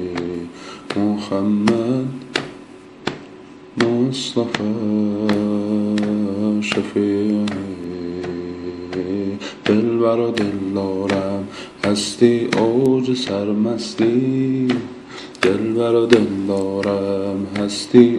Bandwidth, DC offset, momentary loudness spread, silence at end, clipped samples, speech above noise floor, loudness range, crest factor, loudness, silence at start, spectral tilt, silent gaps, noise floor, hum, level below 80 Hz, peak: 11.5 kHz; under 0.1%; 13 LU; 0 s; under 0.1%; 22 dB; 4 LU; 18 dB; -19 LUFS; 0 s; -6 dB/octave; none; -40 dBFS; none; -56 dBFS; 0 dBFS